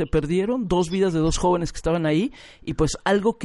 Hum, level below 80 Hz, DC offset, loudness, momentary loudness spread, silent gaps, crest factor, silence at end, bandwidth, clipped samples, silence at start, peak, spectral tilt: none; -36 dBFS; under 0.1%; -23 LUFS; 4 LU; none; 16 dB; 0 s; 11.5 kHz; under 0.1%; 0 s; -6 dBFS; -5.5 dB/octave